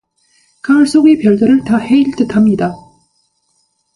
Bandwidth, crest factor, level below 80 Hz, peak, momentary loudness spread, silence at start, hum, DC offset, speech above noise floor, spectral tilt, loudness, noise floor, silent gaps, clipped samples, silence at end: 11.5 kHz; 12 dB; -48 dBFS; 0 dBFS; 7 LU; 0.65 s; none; under 0.1%; 51 dB; -6.5 dB/octave; -11 LUFS; -61 dBFS; none; under 0.1%; 1.2 s